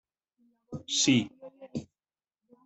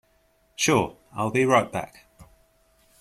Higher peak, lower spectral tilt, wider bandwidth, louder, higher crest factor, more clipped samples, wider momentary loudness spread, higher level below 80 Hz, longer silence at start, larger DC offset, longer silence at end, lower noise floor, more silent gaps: second, -12 dBFS vs -6 dBFS; about the same, -3 dB/octave vs -4 dB/octave; second, 8.4 kHz vs 15 kHz; about the same, -26 LUFS vs -24 LUFS; about the same, 22 dB vs 20 dB; neither; first, 21 LU vs 17 LU; second, -70 dBFS vs -58 dBFS; about the same, 0.7 s vs 0.6 s; neither; about the same, 0.8 s vs 0.75 s; first, under -90 dBFS vs -64 dBFS; neither